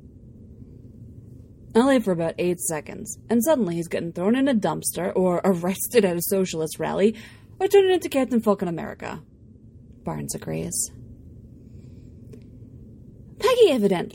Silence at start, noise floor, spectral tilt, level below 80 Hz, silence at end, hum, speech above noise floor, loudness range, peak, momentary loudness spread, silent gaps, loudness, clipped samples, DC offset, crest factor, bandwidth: 0.15 s; -48 dBFS; -5 dB/octave; -52 dBFS; 0 s; none; 25 dB; 11 LU; -4 dBFS; 16 LU; none; -23 LUFS; under 0.1%; under 0.1%; 20 dB; 16.5 kHz